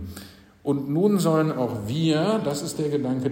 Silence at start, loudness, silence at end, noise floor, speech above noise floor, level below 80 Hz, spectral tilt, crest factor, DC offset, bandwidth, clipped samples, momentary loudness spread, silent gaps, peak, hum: 0 s; -24 LUFS; 0 s; -44 dBFS; 22 dB; -60 dBFS; -6.5 dB/octave; 16 dB; under 0.1%; 16.5 kHz; under 0.1%; 8 LU; none; -8 dBFS; none